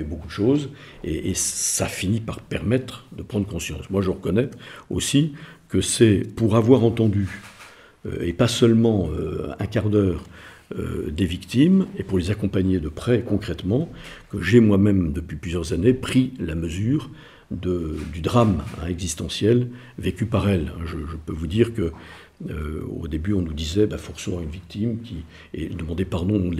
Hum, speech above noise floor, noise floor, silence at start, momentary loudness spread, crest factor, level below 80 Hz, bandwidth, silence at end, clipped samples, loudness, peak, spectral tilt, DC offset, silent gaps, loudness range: none; 24 dB; -47 dBFS; 0 s; 15 LU; 20 dB; -42 dBFS; 15 kHz; 0 s; under 0.1%; -23 LUFS; -2 dBFS; -6 dB/octave; under 0.1%; none; 6 LU